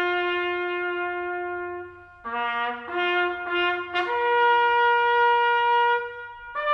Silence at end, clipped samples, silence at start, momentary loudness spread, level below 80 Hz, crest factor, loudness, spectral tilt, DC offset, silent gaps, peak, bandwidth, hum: 0 s; under 0.1%; 0 s; 14 LU; -62 dBFS; 14 dB; -23 LUFS; -4.5 dB/octave; under 0.1%; none; -10 dBFS; 6.4 kHz; none